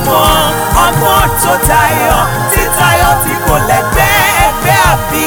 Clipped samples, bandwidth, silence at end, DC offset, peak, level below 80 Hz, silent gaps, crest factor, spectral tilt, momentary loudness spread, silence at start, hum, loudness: under 0.1%; over 20 kHz; 0 s; under 0.1%; 0 dBFS; -20 dBFS; none; 10 dB; -3.5 dB/octave; 3 LU; 0 s; none; -9 LUFS